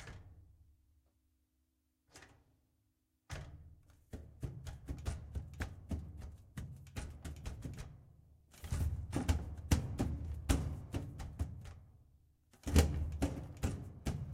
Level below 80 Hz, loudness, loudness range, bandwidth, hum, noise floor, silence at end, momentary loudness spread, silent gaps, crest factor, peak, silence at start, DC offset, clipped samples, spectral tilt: -44 dBFS; -41 LUFS; 17 LU; 16 kHz; none; -80 dBFS; 0 s; 18 LU; none; 28 dB; -14 dBFS; 0 s; under 0.1%; under 0.1%; -6 dB/octave